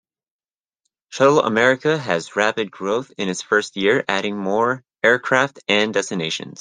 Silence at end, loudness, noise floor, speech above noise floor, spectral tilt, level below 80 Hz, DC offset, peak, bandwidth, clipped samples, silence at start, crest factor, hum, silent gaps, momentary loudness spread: 0.1 s; -19 LUFS; under -90 dBFS; over 71 dB; -4 dB/octave; -66 dBFS; under 0.1%; -2 dBFS; 10 kHz; under 0.1%; 1.1 s; 20 dB; none; none; 8 LU